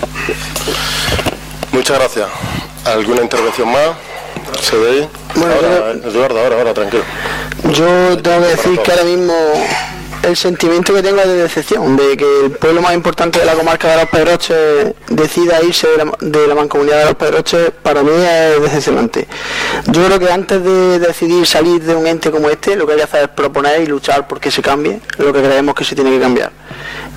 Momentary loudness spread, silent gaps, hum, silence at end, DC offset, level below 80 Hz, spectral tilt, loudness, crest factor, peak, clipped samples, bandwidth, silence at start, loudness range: 8 LU; none; none; 0 s; under 0.1%; -36 dBFS; -4 dB/octave; -12 LUFS; 10 dB; -2 dBFS; under 0.1%; 16.5 kHz; 0 s; 3 LU